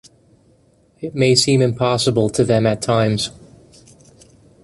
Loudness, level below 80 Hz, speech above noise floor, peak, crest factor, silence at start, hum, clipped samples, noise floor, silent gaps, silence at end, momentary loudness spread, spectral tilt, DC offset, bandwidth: -17 LUFS; -50 dBFS; 39 dB; -2 dBFS; 18 dB; 1 s; none; under 0.1%; -55 dBFS; none; 1.35 s; 11 LU; -5 dB/octave; under 0.1%; 11.5 kHz